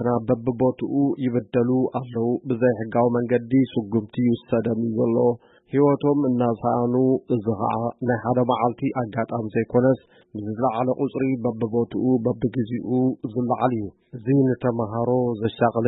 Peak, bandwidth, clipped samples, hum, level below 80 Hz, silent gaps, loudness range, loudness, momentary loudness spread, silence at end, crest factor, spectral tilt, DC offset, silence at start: -6 dBFS; 4 kHz; under 0.1%; none; -58 dBFS; none; 2 LU; -23 LUFS; 6 LU; 0 s; 16 dB; -13 dB/octave; under 0.1%; 0 s